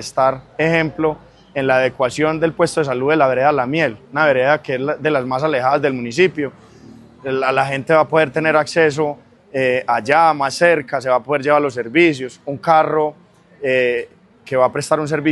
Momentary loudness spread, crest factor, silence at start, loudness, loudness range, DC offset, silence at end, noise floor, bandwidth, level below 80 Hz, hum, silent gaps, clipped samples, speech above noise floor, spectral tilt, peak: 9 LU; 16 dB; 0 s; -17 LUFS; 2 LU; under 0.1%; 0 s; -42 dBFS; 12 kHz; -56 dBFS; none; none; under 0.1%; 25 dB; -5.5 dB/octave; 0 dBFS